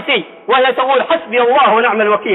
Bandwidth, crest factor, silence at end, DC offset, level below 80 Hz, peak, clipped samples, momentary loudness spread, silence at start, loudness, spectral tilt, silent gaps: 4.1 kHz; 12 dB; 0 s; under 0.1%; -64 dBFS; -2 dBFS; under 0.1%; 5 LU; 0 s; -12 LUFS; -7 dB/octave; none